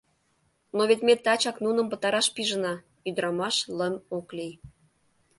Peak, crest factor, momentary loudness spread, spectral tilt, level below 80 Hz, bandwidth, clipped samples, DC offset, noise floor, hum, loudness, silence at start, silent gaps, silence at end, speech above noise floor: -8 dBFS; 20 dB; 13 LU; -3 dB/octave; -68 dBFS; 11.5 kHz; under 0.1%; under 0.1%; -70 dBFS; none; -26 LUFS; 0.75 s; none; 0.7 s; 44 dB